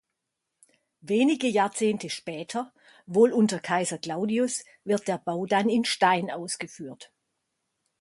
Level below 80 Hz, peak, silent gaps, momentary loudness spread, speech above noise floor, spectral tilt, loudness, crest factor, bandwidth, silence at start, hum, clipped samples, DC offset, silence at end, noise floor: -74 dBFS; -8 dBFS; none; 11 LU; 57 dB; -4.5 dB/octave; -26 LUFS; 20 dB; 11.5 kHz; 1.05 s; none; under 0.1%; under 0.1%; 0.95 s; -83 dBFS